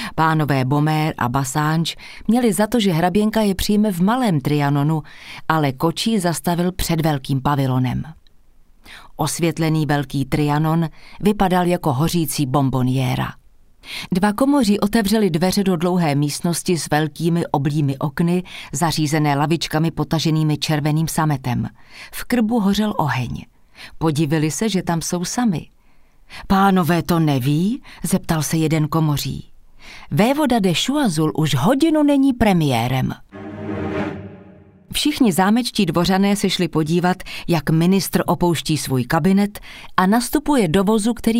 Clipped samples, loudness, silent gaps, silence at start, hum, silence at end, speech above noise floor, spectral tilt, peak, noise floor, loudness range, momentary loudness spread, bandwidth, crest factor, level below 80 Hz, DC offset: under 0.1%; -19 LUFS; none; 0 s; none; 0 s; 30 dB; -5.5 dB/octave; 0 dBFS; -48 dBFS; 3 LU; 9 LU; 16 kHz; 18 dB; -40 dBFS; under 0.1%